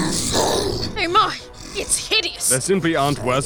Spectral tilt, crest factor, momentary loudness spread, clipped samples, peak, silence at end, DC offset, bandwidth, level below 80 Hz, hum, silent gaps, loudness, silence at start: -3 dB/octave; 18 dB; 6 LU; under 0.1%; -4 dBFS; 0 s; under 0.1%; over 20 kHz; -40 dBFS; none; none; -19 LUFS; 0 s